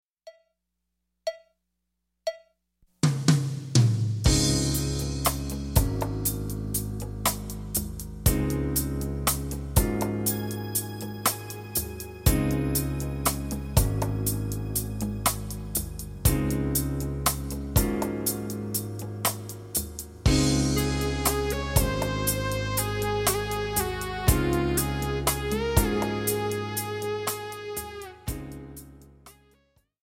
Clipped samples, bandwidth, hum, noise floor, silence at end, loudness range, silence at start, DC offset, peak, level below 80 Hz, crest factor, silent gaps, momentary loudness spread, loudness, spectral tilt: under 0.1%; 16.5 kHz; none; -81 dBFS; 0.7 s; 3 LU; 0.25 s; under 0.1%; -4 dBFS; -36 dBFS; 22 dB; none; 11 LU; -27 LUFS; -4.5 dB/octave